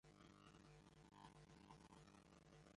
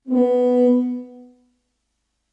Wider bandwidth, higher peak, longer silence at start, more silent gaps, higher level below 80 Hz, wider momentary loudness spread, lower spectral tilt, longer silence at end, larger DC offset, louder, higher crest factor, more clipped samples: first, 11 kHz vs 5 kHz; second, -48 dBFS vs -8 dBFS; about the same, 0.05 s vs 0.05 s; neither; second, -78 dBFS vs -70 dBFS; second, 3 LU vs 11 LU; second, -5 dB/octave vs -8 dB/octave; second, 0 s vs 1.1 s; neither; second, -67 LUFS vs -18 LUFS; first, 20 dB vs 12 dB; neither